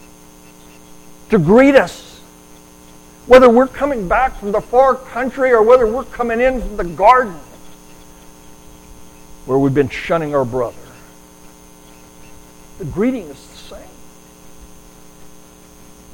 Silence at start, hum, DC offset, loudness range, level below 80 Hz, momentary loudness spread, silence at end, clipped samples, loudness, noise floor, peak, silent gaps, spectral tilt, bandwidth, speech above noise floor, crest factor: 1.3 s; none; under 0.1%; 14 LU; -38 dBFS; 22 LU; 0.85 s; under 0.1%; -14 LUFS; -42 dBFS; 0 dBFS; none; -6.5 dB/octave; 17 kHz; 29 dB; 16 dB